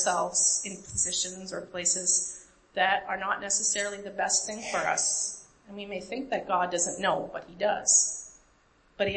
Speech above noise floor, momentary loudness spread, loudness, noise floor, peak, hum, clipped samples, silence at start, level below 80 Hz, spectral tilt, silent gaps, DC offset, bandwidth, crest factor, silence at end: 34 dB; 15 LU; -27 LUFS; -63 dBFS; -10 dBFS; none; under 0.1%; 0 s; -62 dBFS; -0.5 dB/octave; none; under 0.1%; 8.8 kHz; 20 dB; 0 s